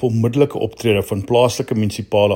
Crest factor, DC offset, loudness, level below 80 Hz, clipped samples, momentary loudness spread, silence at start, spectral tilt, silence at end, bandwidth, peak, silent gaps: 16 dB; under 0.1%; -18 LUFS; -50 dBFS; under 0.1%; 5 LU; 0 s; -6 dB/octave; 0 s; 16.5 kHz; 0 dBFS; none